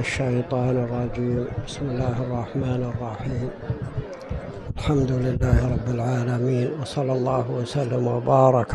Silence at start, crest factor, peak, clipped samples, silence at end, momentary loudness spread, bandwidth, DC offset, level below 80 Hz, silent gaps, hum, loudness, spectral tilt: 0 s; 18 dB; -4 dBFS; under 0.1%; 0 s; 9 LU; 10.5 kHz; under 0.1%; -36 dBFS; none; none; -24 LUFS; -7.5 dB/octave